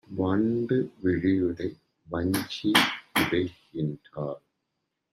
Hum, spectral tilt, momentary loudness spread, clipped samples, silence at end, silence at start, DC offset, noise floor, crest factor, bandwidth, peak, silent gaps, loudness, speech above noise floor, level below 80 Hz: none; -5 dB/octave; 13 LU; under 0.1%; 0.75 s; 0.1 s; under 0.1%; -81 dBFS; 24 dB; 15.5 kHz; -4 dBFS; none; -27 LUFS; 54 dB; -60 dBFS